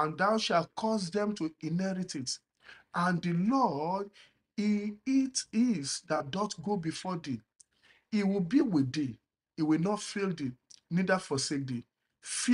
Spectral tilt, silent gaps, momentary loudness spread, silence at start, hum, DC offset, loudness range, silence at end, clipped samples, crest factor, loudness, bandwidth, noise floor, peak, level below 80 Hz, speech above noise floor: -5 dB/octave; none; 10 LU; 0 s; none; under 0.1%; 2 LU; 0 s; under 0.1%; 18 dB; -32 LUFS; 11.5 kHz; -67 dBFS; -14 dBFS; -72 dBFS; 36 dB